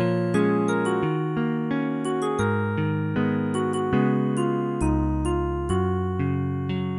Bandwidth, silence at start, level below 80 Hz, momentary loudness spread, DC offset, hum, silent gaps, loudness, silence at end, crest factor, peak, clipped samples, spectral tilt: 11.5 kHz; 0 s; -38 dBFS; 4 LU; under 0.1%; none; none; -24 LUFS; 0 s; 14 dB; -10 dBFS; under 0.1%; -7.5 dB/octave